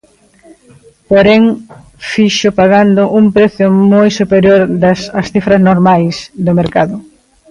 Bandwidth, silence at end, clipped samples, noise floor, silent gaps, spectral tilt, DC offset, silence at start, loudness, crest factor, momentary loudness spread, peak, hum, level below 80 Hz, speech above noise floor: 10.5 kHz; 0.5 s; under 0.1%; -44 dBFS; none; -6.5 dB/octave; under 0.1%; 1.1 s; -9 LUFS; 10 dB; 9 LU; 0 dBFS; none; -42 dBFS; 36 dB